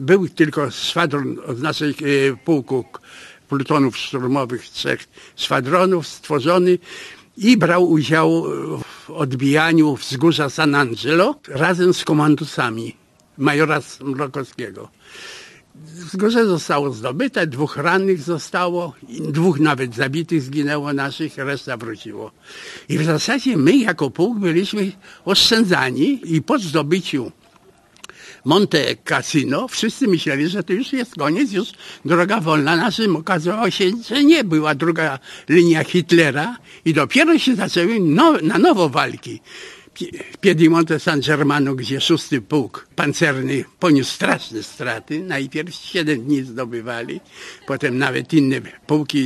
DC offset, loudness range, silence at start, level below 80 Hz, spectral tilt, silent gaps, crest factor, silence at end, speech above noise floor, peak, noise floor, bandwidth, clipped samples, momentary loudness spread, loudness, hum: under 0.1%; 6 LU; 0 s; -60 dBFS; -5.5 dB/octave; none; 18 dB; 0 s; 34 dB; 0 dBFS; -52 dBFS; 13 kHz; under 0.1%; 16 LU; -18 LUFS; none